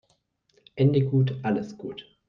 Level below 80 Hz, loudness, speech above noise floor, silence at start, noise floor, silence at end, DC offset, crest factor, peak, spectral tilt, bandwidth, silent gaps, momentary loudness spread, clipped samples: -66 dBFS; -25 LUFS; 45 dB; 0.75 s; -70 dBFS; 0.25 s; under 0.1%; 16 dB; -10 dBFS; -9 dB/octave; 6.4 kHz; none; 17 LU; under 0.1%